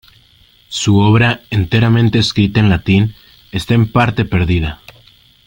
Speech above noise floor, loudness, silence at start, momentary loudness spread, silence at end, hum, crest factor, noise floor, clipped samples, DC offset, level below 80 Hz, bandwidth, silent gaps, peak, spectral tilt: 37 dB; -13 LUFS; 0.7 s; 12 LU; 0.7 s; none; 14 dB; -49 dBFS; under 0.1%; under 0.1%; -36 dBFS; 16.5 kHz; none; 0 dBFS; -6 dB/octave